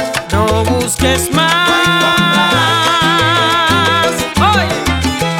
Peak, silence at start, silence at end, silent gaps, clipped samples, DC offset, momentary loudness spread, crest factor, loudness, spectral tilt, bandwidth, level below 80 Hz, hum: 0 dBFS; 0 s; 0 s; none; under 0.1%; under 0.1%; 4 LU; 12 dB; -11 LUFS; -3.5 dB/octave; 18 kHz; -32 dBFS; none